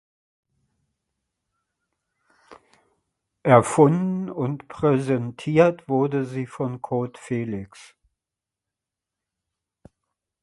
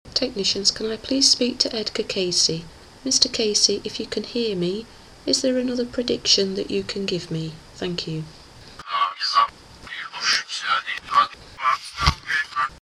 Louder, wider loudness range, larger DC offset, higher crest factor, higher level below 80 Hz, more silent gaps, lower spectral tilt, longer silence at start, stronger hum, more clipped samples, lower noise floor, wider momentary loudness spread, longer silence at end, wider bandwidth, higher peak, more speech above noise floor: about the same, -22 LUFS vs -21 LUFS; first, 13 LU vs 5 LU; neither; about the same, 24 dB vs 24 dB; second, -60 dBFS vs -42 dBFS; neither; first, -7.5 dB/octave vs -2.5 dB/octave; first, 2.5 s vs 0.05 s; neither; neither; first, -88 dBFS vs -42 dBFS; about the same, 12 LU vs 13 LU; first, 2.6 s vs 0.05 s; second, 11.5 kHz vs 15.5 kHz; about the same, 0 dBFS vs 0 dBFS; first, 66 dB vs 19 dB